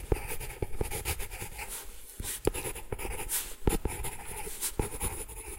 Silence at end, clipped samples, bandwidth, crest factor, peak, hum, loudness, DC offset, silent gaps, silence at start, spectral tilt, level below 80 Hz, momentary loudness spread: 0 s; under 0.1%; 17 kHz; 26 dB; -10 dBFS; none; -35 LUFS; under 0.1%; none; 0 s; -3.5 dB/octave; -40 dBFS; 7 LU